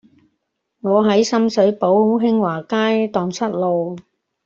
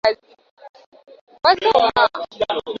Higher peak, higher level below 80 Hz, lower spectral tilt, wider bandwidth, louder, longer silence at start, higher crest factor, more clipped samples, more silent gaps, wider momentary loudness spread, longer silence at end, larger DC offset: about the same, -4 dBFS vs -2 dBFS; second, -62 dBFS vs -56 dBFS; first, -6 dB/octave vs -4 dB/octave; about the same, 7.6 kHz vs 7.4 kHz; about the same, -17 LUFS vs -18 LUFS; first, 0.85 s vs 0.05 s; about the same, 14 dB vs 18 dB; neither; second, none vs 0.51-0.57 s, 0.69-0.74 s, 0.86-0.92 s, 1.21-1.27 s; about the same, 7 LU vs 9 LU; first, 0.45 s vs 0 s; neither